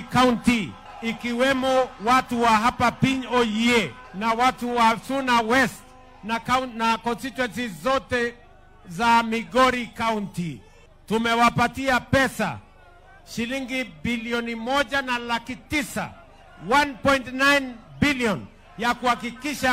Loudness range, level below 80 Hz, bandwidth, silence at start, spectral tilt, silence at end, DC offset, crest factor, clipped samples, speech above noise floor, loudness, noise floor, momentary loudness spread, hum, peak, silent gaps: 5 LU; -48 dBFS; 16 kHz; 0 s; -4.5 dB/octave; 0 s; under 0.1%; 18 dB; under 0.1%; 27 dB; -23 LUFS; -49 dBFS; 12 LU; none; -4 dBFS; none